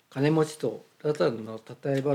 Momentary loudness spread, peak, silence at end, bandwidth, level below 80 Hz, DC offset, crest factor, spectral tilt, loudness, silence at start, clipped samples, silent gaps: 11 LU; -12 dBFS; 0 s; 14.5 kHz; -80 dBFS; under 0.1%; 16 dB; -7 dB/octave; -28 LUFS; 0.1 s; under 0.1%; none